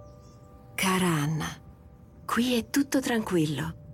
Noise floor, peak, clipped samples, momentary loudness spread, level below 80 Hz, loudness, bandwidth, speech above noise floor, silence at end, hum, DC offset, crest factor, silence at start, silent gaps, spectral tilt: -51 dBFS; -16 dBFS; under 0.1%; 12 LU; -54 dBFS; -27 LUFS; 17 kHz; 24 dB; 0 s; none; under 0.1%; 14 dB; 0 s; none; -5 dB/octave